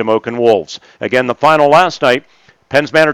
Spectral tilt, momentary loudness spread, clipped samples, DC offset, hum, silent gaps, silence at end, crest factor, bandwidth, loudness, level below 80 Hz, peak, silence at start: -5 dB/octave; 8 LU; under 0.1%; under 0.1%; none; none; 0 s; 12 dB; 15 kHz; -12 LUFS; -54 dBFS; 0 dBFS; 0 s